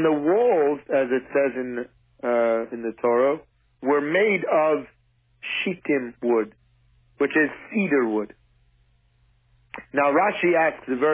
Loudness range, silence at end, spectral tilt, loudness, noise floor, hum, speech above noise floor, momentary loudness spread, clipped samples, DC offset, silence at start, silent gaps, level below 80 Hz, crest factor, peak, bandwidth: 3 LU; 0 s; -9.5 dB/octave; -23 LUFS; -62 dBFS; none; 40 dB; 12 LU; under 0.1%; under 0.1%; 0 s; none; -64 dBFS; 14 dB; -8 dBFS; 3.7 kHz